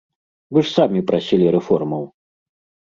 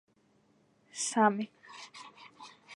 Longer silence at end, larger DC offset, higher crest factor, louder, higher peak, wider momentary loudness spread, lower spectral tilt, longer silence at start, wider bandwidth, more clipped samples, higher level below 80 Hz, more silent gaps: first, 0.8 s vs 0 s; neither; second, 18 dB vs 24 dB; first, -18 LUFS vs -30 LUFS; first, -2 dBFS vs -12 dBFS; second, 10 LU vs 24 LU; first, -7.5 dB/octave vs -3.5 dB/octave; second, 0.5 s vs 0.95 s; second, 7.6 kHz vs 11.5 kHz; neither; first, -58 dBFS vs -88 dBFS; neither